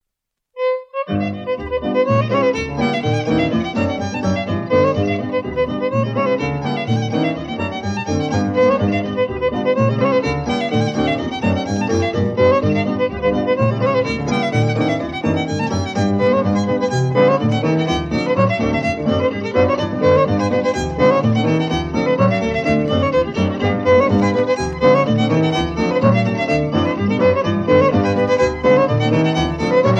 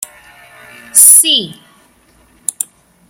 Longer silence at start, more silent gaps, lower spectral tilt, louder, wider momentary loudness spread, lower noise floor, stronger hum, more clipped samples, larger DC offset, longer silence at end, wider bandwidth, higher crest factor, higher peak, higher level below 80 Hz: second, 0.55 s vs 0.95 s; neither; first, -7 dB/octave vs 1 dB/octave; second, -17 LUFS vs -6 LUFS; second, 6 LU vs 22 LU; first, -79 dBFS vs -49 dBFS; neither; second, under 0.1% vs 1%; neither; second, 0 s vs 1.6 s; second, 8.6 kHz vs over 20 kHz; about the same, 16 dB vs 14 dB; about the same, 0 dBFS vs 0 dBFS; first, -40 dBFS vs -60 dBFS